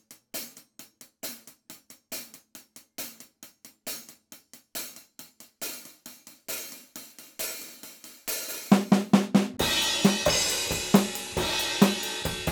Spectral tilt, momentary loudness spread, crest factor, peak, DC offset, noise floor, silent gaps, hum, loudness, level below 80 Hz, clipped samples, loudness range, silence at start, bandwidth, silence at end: -3.5 dB/octave; 25 LU; 24 dB; -6 dBFS; under 0.1%; -52 dBFS; none; none; -27 LUFS; -54 dBFS; under 0.1%; 17 LU; 0.1 s; over 20 kHz; 0 s